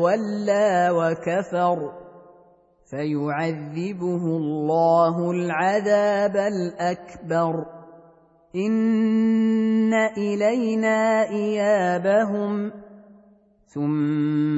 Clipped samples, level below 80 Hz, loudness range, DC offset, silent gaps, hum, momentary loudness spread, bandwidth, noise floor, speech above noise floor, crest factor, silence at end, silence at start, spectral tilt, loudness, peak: under 0.1%; -66 dBFS; 4 LU; under 0.1%; none; none; 9 LU; 8 kHz; -56 dBFS; 35 dB; 16 dB; 0 s; 0 s; -7 dB/octave; -22 LUFS; -8 dBFS